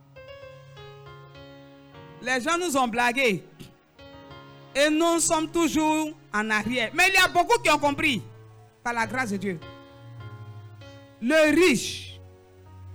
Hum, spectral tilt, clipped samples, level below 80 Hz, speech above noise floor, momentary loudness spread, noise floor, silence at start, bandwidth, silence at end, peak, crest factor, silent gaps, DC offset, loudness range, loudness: none; -3 dB/octave; under 0.1%; -54 dBFS; 27 dB; 25 LU; -50 dBFS; 0.15 s; over 20 kHz; 0 s; -10 dBFS; 16 dB; none; under 0.1%; 6 LU; -23 LUFS